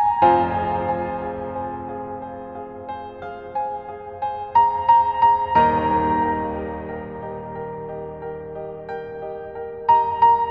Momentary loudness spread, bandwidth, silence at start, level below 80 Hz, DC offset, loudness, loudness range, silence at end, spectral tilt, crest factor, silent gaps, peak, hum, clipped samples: 17 LU; 5 kHz; 0 s; -46 dBFS; under 0.1%; -21 LUFS; 11 LU; 0 s; -8.5 dB/octave; 18 dB; none; -4 dBFS; none; under 0.1%